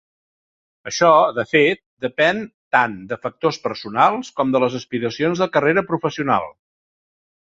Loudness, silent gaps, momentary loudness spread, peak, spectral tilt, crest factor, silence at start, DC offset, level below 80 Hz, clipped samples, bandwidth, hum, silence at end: -19 LUFS; 1.86-1.97 s, 2.54-2.71 s; 12 LU; -2 dBFS; -5 dB/octave; 18 dB; 0.85 s; under 0.1%; -60 dBFS; under 0.1%; 7.8 kHz; none; 0.95 s